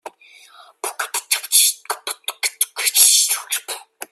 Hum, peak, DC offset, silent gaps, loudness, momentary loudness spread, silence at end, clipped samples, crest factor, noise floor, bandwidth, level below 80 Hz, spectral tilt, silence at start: none; 0 dBFS; under 0.1%; none; -16 LUFS; 18 LU; 0.05 s; under 0.1%; 20 dB; -47 dBFS; 16 kHz; -84 dBFS; 5 dB/octave; 0.05 s